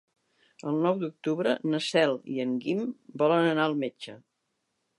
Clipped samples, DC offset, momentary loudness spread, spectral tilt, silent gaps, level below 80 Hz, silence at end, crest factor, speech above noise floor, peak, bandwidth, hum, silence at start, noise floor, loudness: under 0.1%; under 0.1%; 12 LU; -6 dB/octave; none; -82 dBFS; 0.8 s; 18 dB; 51 dB; -10 dBFS; 11.5 kHz; none; 0.65 s; -79 dBFS; -28 LUFS